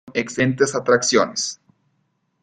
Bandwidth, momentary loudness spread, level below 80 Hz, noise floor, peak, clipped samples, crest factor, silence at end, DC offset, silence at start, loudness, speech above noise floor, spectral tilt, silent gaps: 9.6 kHz; 10 LU; -60 dBFS; -69 dBFS; -2 dBFS; under 0.1%; 18 dB; 0.9 s; under 0.1%; 0.05 s; -19 LUFS; 50 dB; -3.5 dB/octave; none